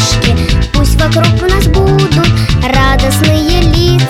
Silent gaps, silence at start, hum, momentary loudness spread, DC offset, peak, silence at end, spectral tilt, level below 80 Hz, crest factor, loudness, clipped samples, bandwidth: none; 0 s; none; 2 LU; under 0.1%; 0 dBFS; 0 s; -5.5 dB/octave; -14 dBFS; 8 dB; -9 LUFS; 0.2%; 16.5 kHz